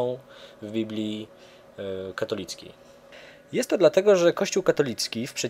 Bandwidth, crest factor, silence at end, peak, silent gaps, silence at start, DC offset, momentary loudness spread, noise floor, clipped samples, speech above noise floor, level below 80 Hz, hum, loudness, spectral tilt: 16 kHz; 20 dB; 0 s; -6 dBFS; none; 0 s; under 0.1%; 18 LU; -48 dBFS; under 0.1%; 23 dB; -66 dBFS; none; -25 LUFS; -4 dB/octave